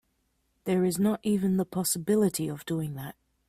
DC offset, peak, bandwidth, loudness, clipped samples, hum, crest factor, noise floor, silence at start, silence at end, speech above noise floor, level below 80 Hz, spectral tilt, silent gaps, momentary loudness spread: under 0.1%; -14 dBFS; 16 kHz; -28 LUFS; under 0.1%; none; 14 dB; -74 dBFS; 0.65 s; 0.4 s; 46 dB; -62 dBFS; -5.5 dB/octave; none; 12 LU